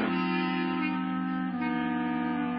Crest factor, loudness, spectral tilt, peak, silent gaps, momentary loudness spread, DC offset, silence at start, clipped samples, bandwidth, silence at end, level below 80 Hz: 12 dB; -30 LUFS; -10 dB/octave; -16 dBFS; none; 3 LU; under 0.1%; 0 s; under 0.1%; 5.4 kHz; 0 s; -66 dBFS